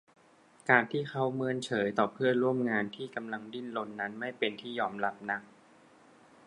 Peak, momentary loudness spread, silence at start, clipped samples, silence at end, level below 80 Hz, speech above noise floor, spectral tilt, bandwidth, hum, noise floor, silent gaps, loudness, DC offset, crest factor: -8 dBFS; 12 LU; 0.65 s; under 0.1%; 1 s; -78 dBFS; 30 dB; -6 dB/octave; 11 kHz; none; -62 dBFS; none; -32 LUFS; under 0.1%; 26 dB